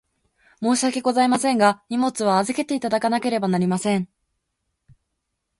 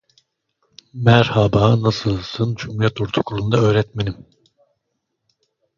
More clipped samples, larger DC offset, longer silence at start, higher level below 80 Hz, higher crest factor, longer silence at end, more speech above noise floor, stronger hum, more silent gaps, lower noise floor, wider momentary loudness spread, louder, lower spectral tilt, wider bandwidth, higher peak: neither; neither; second, 0.6 s vs 0.95 s; second, -64 dBFS vs -44 dBFS; about the same, 18 dB vs 20 dB; about the same, 1.55 s vs 1.65 s; about the same, 57 dB vs 57 dB; neither; neither; about the same, -77 dBFS vs -75 dBFS; second, 5 LU vs 11 LU; second, -21 LUFS vs -18 LUFS; second, -5 dB/octave vs -7 dB/octave; first, 11.5 kHz vs 7.2 kHz; second, -4 dBFS vs 0 dBFS